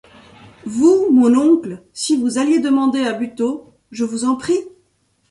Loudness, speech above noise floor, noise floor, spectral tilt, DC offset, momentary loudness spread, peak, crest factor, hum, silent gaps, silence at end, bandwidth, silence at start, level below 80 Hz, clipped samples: -17 LUFS; 47 dB; -62 dBFS; -4.5 dB/octave; under 0.1%; 14 LU; -2 dBFS; 14 dB; none; none; 0.65 s; 11.5 kHz; 0.65 s; -60 dBFS; under 0.1%